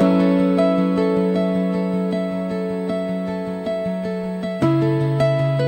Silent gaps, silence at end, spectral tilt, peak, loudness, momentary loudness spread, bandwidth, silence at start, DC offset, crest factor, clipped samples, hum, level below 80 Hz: none; 0 s; -8.5 dB/octave; -6 dBFS; -20 LUFS; 8 LU; 9 kHz; 0 s; under 0.1%; 14 dB; under 0.1%; none; -52 dBFS